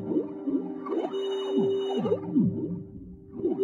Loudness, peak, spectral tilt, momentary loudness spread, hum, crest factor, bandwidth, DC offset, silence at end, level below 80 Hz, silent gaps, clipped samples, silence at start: -29 LUFS; -14 dBFS; -8.5 dB/octave; 12 LU; none; 16 dB; 7.4 kHz; under 0.1%; 0 s; -60 dBFS; none; under 0.1%; 0 s